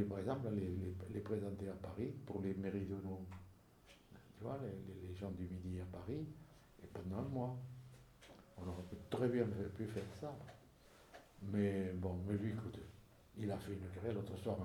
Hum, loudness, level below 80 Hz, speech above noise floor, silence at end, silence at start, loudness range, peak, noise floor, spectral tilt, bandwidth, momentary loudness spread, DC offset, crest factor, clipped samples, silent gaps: none; -45 LUFS; -66 dBFS; 23 dB; 0 s; 0 s; 5 LU; -24 dBFS; -66 dBFS; -8 dB/octave; 18.5 kHz; 21 LU; under 0.1%; 22 dB; under 0.1%; none